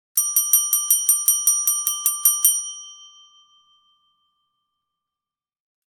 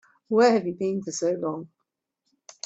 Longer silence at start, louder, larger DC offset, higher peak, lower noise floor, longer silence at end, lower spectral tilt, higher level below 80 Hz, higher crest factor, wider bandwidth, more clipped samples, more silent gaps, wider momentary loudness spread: second, 0.15 s vs 0.3 s; first, -17 LUFS vs -24 LUFS; neither; first, 0 dBFS vs -8 dBFS; first, -90 dBFS vs -81 dBFS; first, 2.85 s vs 1 s; second, 6 dB/octave vs -5 dB/octave; about the same, -74 dBFS vs -72 dBFS; about the same, 22 dB vs 18 dB; first, 19 kHz vs 8.2 kHz; neither; neither; second, 6 LU vs 11 LU